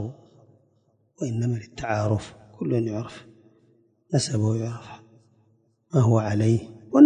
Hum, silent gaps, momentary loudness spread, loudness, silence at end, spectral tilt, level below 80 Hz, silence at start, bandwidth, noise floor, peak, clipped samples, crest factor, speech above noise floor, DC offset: none; none; 18 LU; -26 LUFS; 0 s; -7 dB/octave; -54 dBFS; 0 s; 10 kHz; -66 dBFS; -2 dBFS; under 0.1%; 22 dB; 42 dB; under 0.1%